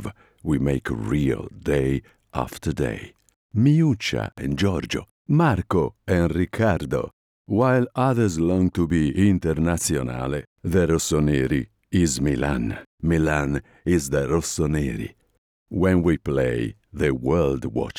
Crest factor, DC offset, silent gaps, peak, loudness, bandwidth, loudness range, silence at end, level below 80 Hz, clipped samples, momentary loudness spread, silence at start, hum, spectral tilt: 16 dB; under 0.1%; 3.36-3.49 s, 5.11-5.25 s, 7.13-7.45 s, 10.47-10.56 s, 12.86-12.98 s, 15.38-15.66 s; -6 dBFS; -23 LUFS; 16.5 kHz; 3 LU; 0 s; -40 dBFS; under 0.1%; 9 LU; 0 s; none; -6 dB/octave